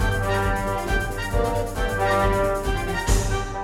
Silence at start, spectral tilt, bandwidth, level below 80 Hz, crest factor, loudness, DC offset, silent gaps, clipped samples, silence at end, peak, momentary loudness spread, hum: 0 s; -5 dB/octave; 16.5 kHz; -28 dBFS; 16 dB; -23 LUFS; under 0.1%; none; under 0.1%; 0 s; -6 dBFS; 5 LU; none